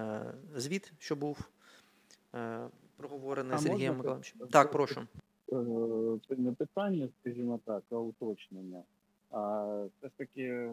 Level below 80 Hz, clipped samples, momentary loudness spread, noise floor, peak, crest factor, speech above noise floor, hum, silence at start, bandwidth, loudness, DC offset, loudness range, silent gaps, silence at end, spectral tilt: -72 dBFS; under 0.1%; 16 LU; -65 dBFS; -8 dBFS; 28 dB; 30 dB; none; 0 s; 16 kHz; -35 LUFS; under 0.1%; 8 LU; none; 0 s; -6 dB/octave